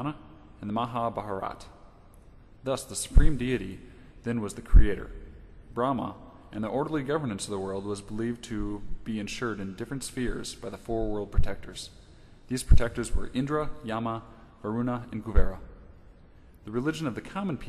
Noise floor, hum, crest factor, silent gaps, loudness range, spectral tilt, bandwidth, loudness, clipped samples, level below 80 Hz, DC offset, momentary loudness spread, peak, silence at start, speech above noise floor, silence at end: -53 dBFS; none; 20 dB; none; 5 LU; -6 dB/octave; 12.5 kHz; -31 LUFS; under 0.1%; -30 dBFS; under 0.1%; 17 LU; -6 dBFS; 0 s; 27 dB; 0 s